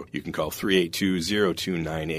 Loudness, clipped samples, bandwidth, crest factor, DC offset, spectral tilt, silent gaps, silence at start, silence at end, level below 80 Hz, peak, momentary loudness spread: -25 LUFS; under 0.1%; 16 kHz; 18 dB; under 0.1%; -4.5 dB/octave; none; 0 s; 0 s; -52 dBFS; -8 dBFS; 7 LU